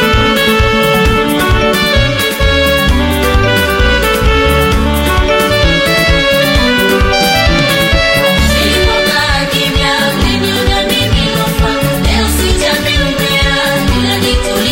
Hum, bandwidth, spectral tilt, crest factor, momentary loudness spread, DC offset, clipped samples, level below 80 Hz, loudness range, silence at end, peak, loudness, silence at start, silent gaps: none; 16.5 kHz; -4.5 dB/octave; 10 dB; 3 LU; under 0.1%; under 0.1%; -16 dBFS; 2 LU; 0 s; 0 dBFS; -10 LUFS; 0 s; none